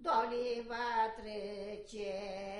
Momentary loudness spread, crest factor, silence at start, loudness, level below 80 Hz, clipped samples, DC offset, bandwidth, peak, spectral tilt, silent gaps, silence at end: 10 LU; 18 dB; 0 s; -38 LUFS; -62 dBFS; under 0.1%; under 0.1%; 11.5 kHz; -20 dBFS; -4 dB/octave; none; 0 s